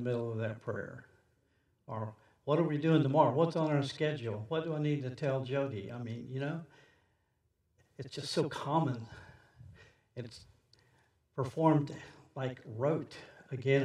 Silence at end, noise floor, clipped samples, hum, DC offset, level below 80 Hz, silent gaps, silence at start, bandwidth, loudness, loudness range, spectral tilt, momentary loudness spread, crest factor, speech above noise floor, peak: 0 s; -77 dBFS; under 0.1%; none; under 0.1%; -74 dBFS; none; 0 s; 11 kHz; -34 LUFS; 8 LU; -7 dB/octave; 19 LU; 22 dB; 44 dB; -14 dBFS